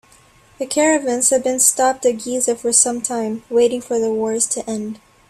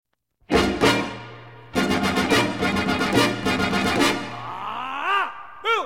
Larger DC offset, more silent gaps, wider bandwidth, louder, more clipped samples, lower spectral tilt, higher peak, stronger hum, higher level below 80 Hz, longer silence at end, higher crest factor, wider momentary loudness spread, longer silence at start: second, under 0.1% vs 0.3%; neither; about the same, 15.5 kHz vs 16.5 kHz; first, -17 LUFS vs -22 LUFS; neither; second, -2 dB/octave vs -4 dB/octave; first, 0 dBFS vs -6 dBFS; neither; second, -60 dBFS vs -44 dBFS; first, 0.35 s vs 0 s; about the same, 18 dB vs 18 dB; about the same, 10 LU vs 11 LU; about the same, 0.6 s vs 0.5 s